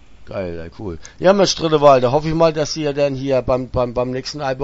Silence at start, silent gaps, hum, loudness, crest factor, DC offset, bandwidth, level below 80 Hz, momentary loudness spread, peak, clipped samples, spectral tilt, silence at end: 0.1 s; none; none; -17 LUFS; 18 dB; under 0.1%; 8 kHz; -38 dBFS; 17 LU; 0 dBFS; under 0.1%; -5 dB/octave; 0 s